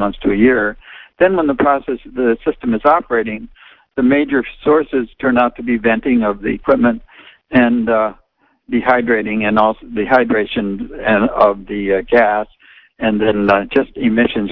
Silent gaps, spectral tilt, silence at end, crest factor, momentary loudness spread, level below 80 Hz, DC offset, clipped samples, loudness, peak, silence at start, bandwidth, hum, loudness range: none; -9 dB/octave; 0 s; 14 dB; 8 LU; -40 dBFS; under 0.1%; under 0.1%; -15 LUFS; 0 dBFS; 0 s; 5.4 kHz; none; 1 LU